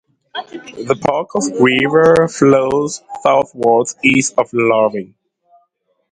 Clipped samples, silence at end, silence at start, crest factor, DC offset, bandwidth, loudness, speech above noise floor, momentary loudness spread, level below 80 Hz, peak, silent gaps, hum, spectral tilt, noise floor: under 0.1%; 1.05 s; 0.35 s; 14 dB; under 0.1%; 11 kHz; -14 LUFS; 49 dB; 16 LU; -52 dBFS; 0 dBFS; none; none; -4.5 dB/octave; -63 dBFS